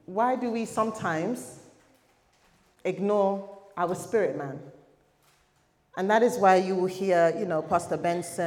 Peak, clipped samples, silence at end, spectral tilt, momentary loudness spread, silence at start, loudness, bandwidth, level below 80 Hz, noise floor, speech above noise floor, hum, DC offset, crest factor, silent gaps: -8 dBFS; under 0.1%; 0 s; -5.5 dB/octave; 14 LU; 0.1 s; -26 LUFS; 17 kHz; -72 dBFS; -67 dBFS; 41 dB; none; under 0.1%; 20 dB; none